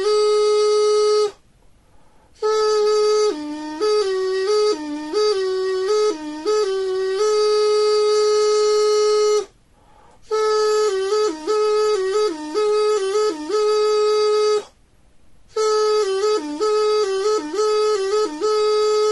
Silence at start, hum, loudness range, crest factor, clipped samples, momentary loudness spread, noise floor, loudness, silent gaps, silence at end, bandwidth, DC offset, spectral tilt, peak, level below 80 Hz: 0 s; none; 3 LU; 10 dB; under 0.1%; 5 LU; -53 dBFS; -19 LUFS; none; 0 s; 11.5 kHz; 0.2%; -1.5 dB/octave; -8 dBFS; -58 dBFS